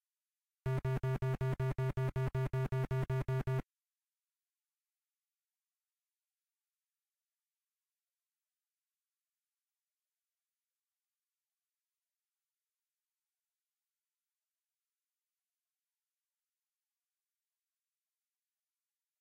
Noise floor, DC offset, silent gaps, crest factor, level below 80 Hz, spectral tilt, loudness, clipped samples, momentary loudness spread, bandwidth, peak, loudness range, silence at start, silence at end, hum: under -90 dBFS; under 0.1%; none; 14 dB; -58 dBFS; -8.5 dB/octave; -37 LUFS; under 0.1%; 3 LU; 8.4 kHz; -28 dBFS; 8 LU; 0.65 s; 15.6 s; none